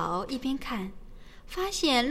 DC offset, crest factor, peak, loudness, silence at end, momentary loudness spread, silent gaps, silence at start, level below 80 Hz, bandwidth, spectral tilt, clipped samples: 0.2%; 18 dB; -12 dBFS; -30 LUFS; 0 s; 14 LU; none; 0 s; -46 dBFS; 16 kHz; -3.5 dB/octave; under 0.1%